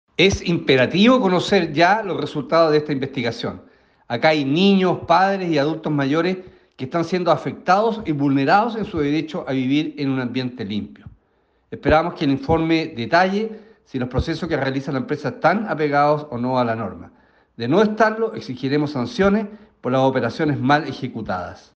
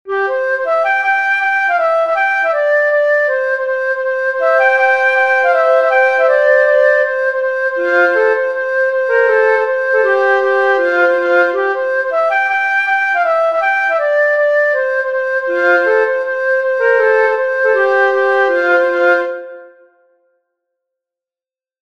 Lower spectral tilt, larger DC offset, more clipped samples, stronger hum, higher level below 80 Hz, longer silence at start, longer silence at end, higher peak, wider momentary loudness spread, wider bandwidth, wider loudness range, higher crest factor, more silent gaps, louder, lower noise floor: first, -6.5 dB/octave vs -2.5 dB/octave; second, under 0.1% vs 0.2%; neither; neither; first, -44 dBFS vs -70 dBFS; first, 0.2 s vs 0.05 s; second, 0.2 s vs 2.15 s; second, -4 dBFS vs 0 dBFS; first, 11 LU vs 5 LU; first, 8.4 kHz vs 7.2 kHz; about the same, 3 LU vs 2 LU; about the same, 16 dB vs 12 dB; neither; second, -20 LUFS vs -13 LUFS; second, -63 dBFS vs under -90 dBFS